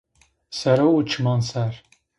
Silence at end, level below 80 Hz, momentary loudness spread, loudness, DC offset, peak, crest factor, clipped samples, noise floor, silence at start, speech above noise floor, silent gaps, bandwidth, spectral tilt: 0.4 s; -58 dBFS; 14 LU; -21 LUFS; under 0.1%; -4 dBFS; 18 dB; under 0.1%; -49 dBFS; 0.5 s; 28 dB; none; 11 kHz; -6.5 dB/octave